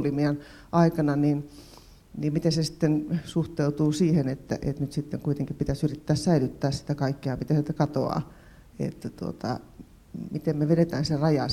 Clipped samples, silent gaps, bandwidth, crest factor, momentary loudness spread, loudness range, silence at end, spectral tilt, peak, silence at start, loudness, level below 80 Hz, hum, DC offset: under 0.1%; none; 14 kHz; 18 dB; 11 LU; 3 LU; 0 s; -7 dB/octave; -8 dBFS; 0 s; -27 LUFS; -50 dBFS; none; under 0.1%